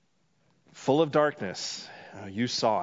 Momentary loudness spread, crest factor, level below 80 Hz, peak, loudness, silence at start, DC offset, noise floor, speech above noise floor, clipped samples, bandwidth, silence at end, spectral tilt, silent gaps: 16 LU; 20 dB; -76 dBFS; -10 dBFS; -28 LUFS; 0.75 s; under 0.1%; -71 dBFS; 43 dB; under 0.1%; 7.8 kHz; 0 s; -4.5 dB/octave; none